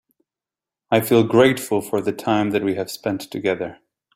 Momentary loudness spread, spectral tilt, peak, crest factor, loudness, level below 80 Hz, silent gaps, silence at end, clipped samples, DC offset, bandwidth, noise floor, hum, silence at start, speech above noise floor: 10 LU; -5.5 dB/octave; -2 dBFS; 20 dB; -20 LUFS; -60 dBFS; none; 0.4 s; under 0.1%; under 0.1%; 16 kHz; -89 dBFS; none; 0.9 s; 70 dB